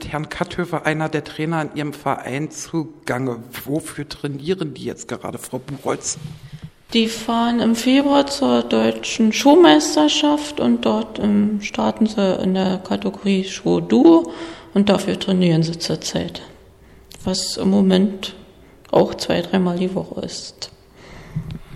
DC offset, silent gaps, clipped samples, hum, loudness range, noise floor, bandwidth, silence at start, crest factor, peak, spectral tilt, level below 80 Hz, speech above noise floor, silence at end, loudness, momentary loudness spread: under 0.1%; none; under 0.1%; none; 10 LU; -46 dBFS; 15 kHz; 0 s; 18 dB; 0 dBFS; -5 dB/octave; -50 dBFS; 28 dB; 0 s; -19 LUFS; 15 LU